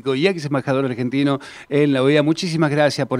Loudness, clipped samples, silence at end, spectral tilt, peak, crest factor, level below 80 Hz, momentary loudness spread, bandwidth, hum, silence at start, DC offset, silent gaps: -19 LUFS; under 0.1%; 0 s; -6 dB/octave; -4 dBFS; 16 dB; -62 dBFS; 6 LU; 11.5 kHz; none; 0.05 s; under 0.1%; none